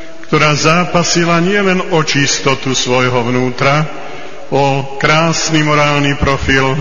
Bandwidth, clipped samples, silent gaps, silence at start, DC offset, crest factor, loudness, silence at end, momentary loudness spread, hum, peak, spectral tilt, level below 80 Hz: 7.4 kHz; 0.1%; none; 0 s; 7%; 14 dB; -12 LUFS; 0 s; 5 LU; none; 0 dBFS; -4 dB/octave; -34 dBFS